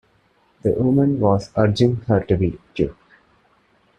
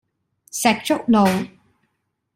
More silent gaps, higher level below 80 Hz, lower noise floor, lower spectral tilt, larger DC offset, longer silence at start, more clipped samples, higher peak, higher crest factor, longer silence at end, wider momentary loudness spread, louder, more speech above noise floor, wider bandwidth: neither; first, -46 dBFS vs -60 dBFS; second, -60 dBFS vs -73 dBFS; first, -8.5 dB/octave vs -4.5 dB/octave; neither; about the same, 0.65 s vs 0.55 s; neither; about the same, -2 dBFS vs -2 dBFS; about the same, 18 dB vs 20 dB; first, 1.05 s vs 0.9 s; second, 8 LU vs 14 LU; about the same, -20 LUFS vs -19 LUFS; second, 42 dB vs 55 dB; second, 9.4 kHz vs 16 kHz